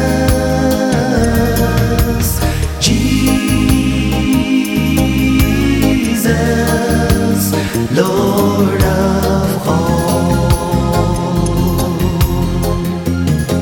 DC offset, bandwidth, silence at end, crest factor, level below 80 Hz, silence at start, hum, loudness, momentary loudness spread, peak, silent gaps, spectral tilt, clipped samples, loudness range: under 0.1%; 17.5 kHz; 0 s; 12 dB; -22 dBFS; 0 s; none; -13 LUFS; 3 LU; 0 dBFS; none; -5.5 dB/octave; under 0.1%; 1 LU